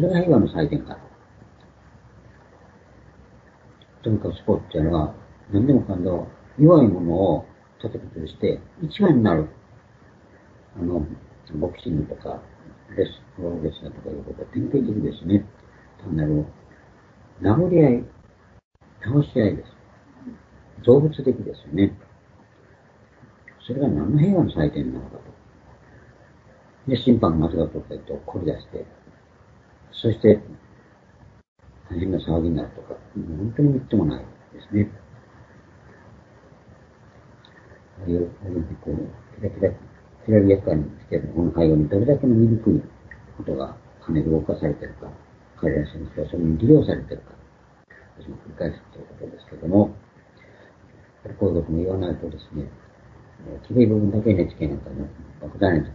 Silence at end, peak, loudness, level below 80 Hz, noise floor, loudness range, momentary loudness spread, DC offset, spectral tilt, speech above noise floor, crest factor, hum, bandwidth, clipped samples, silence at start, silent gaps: 0 s; 0 dBFS; -22 LUFS; -44 dBFS; -53 dBFS; 10 LU; 22 LU; under 0.1%; -10.5 dB/octave; 32 dB; 22 dB; none; 5.6 kHz; under 0.1%; 0 s; 18.65-18.71 s, 31.48-31.56 s